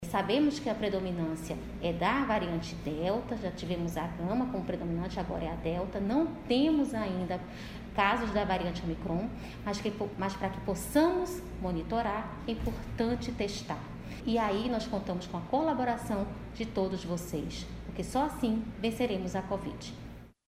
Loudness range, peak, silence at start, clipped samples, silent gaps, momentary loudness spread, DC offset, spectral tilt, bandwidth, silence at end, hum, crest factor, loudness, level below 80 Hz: 3 LU; -12 dBFS; 0 s; under 0.1%; none; 10 LU; under 0.1%; -6 dB/octave; 16 kHz; 0.15 s; none; 20 dB; -33 LUFS; -48 dBFS